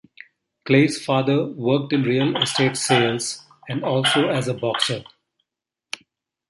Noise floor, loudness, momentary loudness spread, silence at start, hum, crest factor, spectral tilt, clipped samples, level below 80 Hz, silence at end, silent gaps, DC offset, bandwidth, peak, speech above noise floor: -85 dBFS; -20 LUFS; 17 LU; 0.65 s; none; 18 dB; -4.5 dB/octave; under 0.1%; -64 dBFS; 1.45 s; none; under 0.1%; 11.5 kHz; -4 dBFS; 65 dB